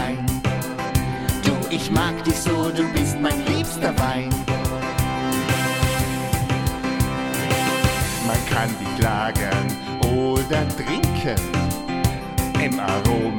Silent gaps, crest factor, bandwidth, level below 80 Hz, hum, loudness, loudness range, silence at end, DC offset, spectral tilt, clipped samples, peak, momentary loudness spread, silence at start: none; 18 dB; 17.5 kHz; -34 dBFS; none; -22 LUFS; 1 LU; 0 s; under 0.1%; -5 dB/octave; under 0.1%; -4 dBFS; 3 LU; 0 s